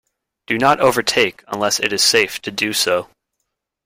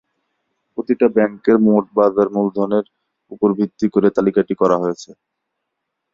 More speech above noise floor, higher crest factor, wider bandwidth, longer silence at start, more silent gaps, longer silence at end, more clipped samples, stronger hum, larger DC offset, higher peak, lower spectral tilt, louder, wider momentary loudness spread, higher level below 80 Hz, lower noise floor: about the same, 59 dB vs 61 dB; about the same, 18 dB vs 16 dB; first, 16.5 kHz vs 7.6 kHz; second, 0.5 s vs 0.8 s; neither; second, 0.8 s vs 1 s; neither; neither; neither; about the same, 0 dBFS vs -2 dBFS; second, -2 dB/octave vs -8 dB/octave; about the same, -16 LUFS vs -17 LUFS; about the same, 8 LU vs 9 LU; about the same, -56 dBFS vs -58 dBFS; about the same, -76 dBFS vs -77 dBFS